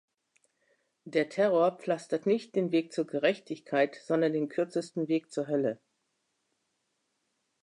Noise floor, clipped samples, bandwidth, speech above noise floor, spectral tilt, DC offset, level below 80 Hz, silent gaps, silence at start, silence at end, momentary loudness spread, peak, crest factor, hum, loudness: -79 dBFS; under 0.1%; 11 kHz; 50 dB; -6 dB/octave; under 0.1%; -86 dBFS; none; 1.05 s; 1.9 s; 7 LU; -14 dBFS; 18 dB; none; -30 LUFS